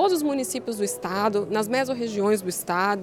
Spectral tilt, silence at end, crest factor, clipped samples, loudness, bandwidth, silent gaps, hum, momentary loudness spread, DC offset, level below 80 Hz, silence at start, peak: -4 dB/octave; 0 s; 14 dB; under 0.1%; -25 LUFS; 17.5 kHz; none; none; 4 LU; under 0.1%; -66 dBFS; 0 s; -10 dBFS